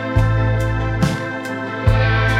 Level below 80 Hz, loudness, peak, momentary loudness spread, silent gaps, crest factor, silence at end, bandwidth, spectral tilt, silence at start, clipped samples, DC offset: -26 dBFS; -19 LUFS; -2 dBFS; 9 LU; none; 14 dB; 0 s; 11.5 kHz; -6.5 dB/octave; 0 s; under 0.1%; under 0.1%